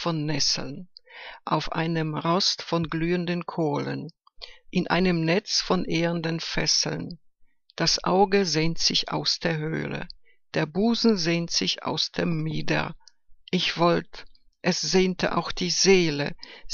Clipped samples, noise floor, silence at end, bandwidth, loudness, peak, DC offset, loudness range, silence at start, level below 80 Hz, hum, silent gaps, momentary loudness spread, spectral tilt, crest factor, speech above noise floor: under 0.1%; -57 dBFS; 0 s; 7.4 kHz; -24 LUFS; -6 dBFS; under 0.1%; 3 LU; 0 s; -46 dBFS; none; none; 14 LU; -4 dB/octave; 20 dB; 33 dB